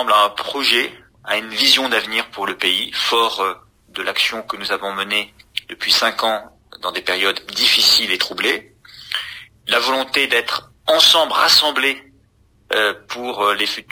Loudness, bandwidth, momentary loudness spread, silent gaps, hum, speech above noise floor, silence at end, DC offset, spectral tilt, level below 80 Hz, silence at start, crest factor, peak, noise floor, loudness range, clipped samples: -16 LUFS; 16 kHz; 14 LU; none; none; 38 dB; 0.1 s; under 0.1%; -0.5 dB/octave; -58 dBFS; 0 s; 18 dB; 0 dBFS; -56 dBFS; 5 LU; under 0.1%